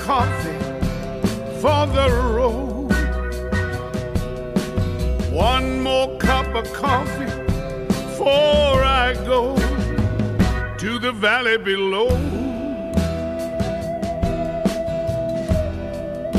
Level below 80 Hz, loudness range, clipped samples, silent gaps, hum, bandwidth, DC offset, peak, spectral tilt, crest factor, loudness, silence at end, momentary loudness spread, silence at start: -28 dBFS; 4 LU; under 0.1%; none; none; 14.5 kHz; under 0.1%; -4 dBFS; -6 dB/octave; 16 dB; -21 LUFS; 0 s; 8 LU; 0 s